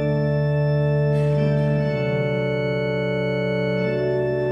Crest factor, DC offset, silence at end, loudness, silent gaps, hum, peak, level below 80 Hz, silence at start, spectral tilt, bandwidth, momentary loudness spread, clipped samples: 12 dB; under 0.1%; 0 s; -22 LUFS; none; none; -10 dBFS; -44 dBFS; 0 s; -9 dB/octave; 5.6 kHz; 3 LU; under 0.1%